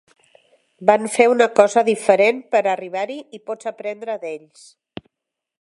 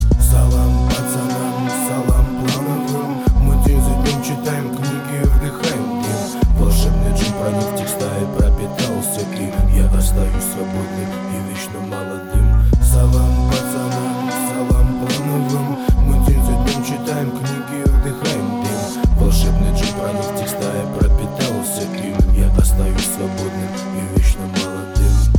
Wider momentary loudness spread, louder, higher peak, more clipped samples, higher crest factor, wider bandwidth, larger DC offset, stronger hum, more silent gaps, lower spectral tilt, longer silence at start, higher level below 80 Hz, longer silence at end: first, 20 LU vs 7 LU; about the same, -18 LUFS vs -18 LUFS; about the same, 0 dBFS vs -2 dBFS; neither; first, 20 dB vs 12 dB; second, 11.5 kHz vs 19.5 kHz; neither; neither; neither; second, -4 dB/octave vs -5.5 dB/octave; first, 0.8 s vs 0 s; second, -68 dBFS vs -18 dBFS; first, 1.2 s vs 0 s